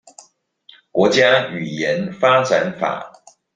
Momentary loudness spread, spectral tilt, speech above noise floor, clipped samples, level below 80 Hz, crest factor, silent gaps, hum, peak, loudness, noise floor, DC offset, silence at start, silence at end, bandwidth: 11 LU; -4.5 dB/octave; 36 dB; under 0.1%; -60 dBFS; 18 dB; none; none; -2 dBFS; -17 LUFS; -53 dBFS; under 0.1%; 0.95 s; 0.45 s; 9.4 kHz